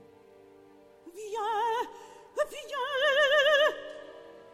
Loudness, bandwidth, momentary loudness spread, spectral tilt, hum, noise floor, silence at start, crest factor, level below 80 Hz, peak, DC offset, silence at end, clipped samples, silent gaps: -27 LUFS; 15 kHz; 22 LU; -0.5 dB/octave; none; -56 dBFS; 1.05 s; 16 dB; -72 dBFS; -14 dBFS; under 0.1%; 0.1 s; under 0.1%; none